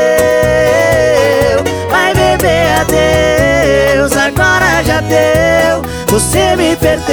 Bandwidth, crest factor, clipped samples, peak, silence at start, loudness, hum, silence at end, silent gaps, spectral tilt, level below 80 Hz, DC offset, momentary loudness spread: over 20 kHz; 10 dB; under 0.1%; 0 dBFS; 0 s; -10 LUFS; none; 0 s; none; -4.5 dB/octave; -26 dBFS; 0.5%; 3 LU